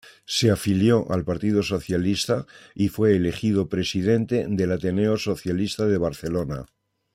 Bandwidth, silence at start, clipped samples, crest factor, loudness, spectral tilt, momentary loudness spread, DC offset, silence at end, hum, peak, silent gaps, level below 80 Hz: 16 kHz; 0.3 s; under 0.1%; 16 dB; -23 LUFS; -6 dB/octave; 7 LU; under 0.1%; 0.5 s; none; -6 dBFS; none; -50 dBFS